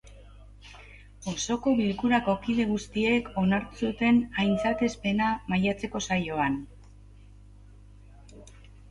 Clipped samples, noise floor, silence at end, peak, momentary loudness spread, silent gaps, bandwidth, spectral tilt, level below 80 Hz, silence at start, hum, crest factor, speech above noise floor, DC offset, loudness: under 0.1%; -50 dBFS; 0 s; -10 dBFS; 11 LU; none; 11 kHz; -5.5 dB/octave; -50 dBFS; 0.05 s; 50 Hz at -45 dBFS; 18 dB; 24 dB; under 0.1%; -27 LUFS